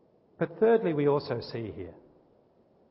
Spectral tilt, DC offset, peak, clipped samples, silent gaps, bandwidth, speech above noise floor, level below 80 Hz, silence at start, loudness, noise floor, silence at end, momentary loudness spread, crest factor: -11 dB/octave; under 0.1%; -14 dBFS; under 0.1%; none; 5.8 kHz; 36 dB; -62 dBFS; 0.4 s; -28 LUFS; -64 dBFS; 0.95 s; 17 LU; 18 dB